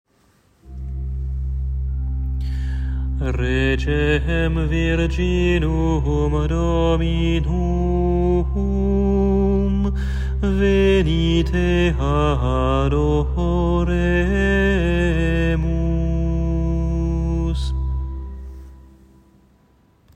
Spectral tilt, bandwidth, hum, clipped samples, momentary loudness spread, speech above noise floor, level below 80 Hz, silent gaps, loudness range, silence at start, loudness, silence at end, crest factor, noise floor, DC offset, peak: -7.5 dB/octave; 8.4 kHz; none; under 0.1%; 8 LU; 40 dB; -22 dBFS; none; 6 LU; 0.65 s; -20 LUFS; 1.35 s; 14 dB; -58 dBFS; under 0.1%; -6 dBFS